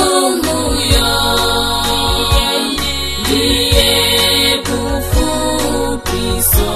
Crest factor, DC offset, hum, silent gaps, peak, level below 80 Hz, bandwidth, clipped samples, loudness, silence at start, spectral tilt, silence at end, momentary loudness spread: 14 dB; under 0.1%; none; none; 0 dBFS; -22 dBFS; 14 kHz; under 0.1%; -13 LUFS; 0 s; -3 dB/octave; 0 s; 7 LU